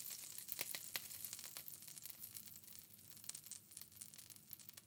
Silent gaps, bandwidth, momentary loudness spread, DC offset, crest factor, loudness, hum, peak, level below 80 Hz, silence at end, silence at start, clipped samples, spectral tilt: none; 19 kHz; 11 LU; under 0.1%; 34 dB; -50 LUFS; none; -18 dBFS; under -90 dBFS; 0 s; 0 s; under 0.1%; 0 dB/octave